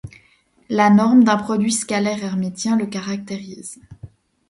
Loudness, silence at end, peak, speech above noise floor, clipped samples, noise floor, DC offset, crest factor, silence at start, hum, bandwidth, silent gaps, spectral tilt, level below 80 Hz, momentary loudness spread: -18 LUFS; 0.45 s; -2 dBFS; 39 dB; under 0.1%; -57 dBFS; under 0.1%; 18 dB; 0.05 s; none; 11.5 kHz; none; -5 dB/octave; -56 dBFS; 20 LU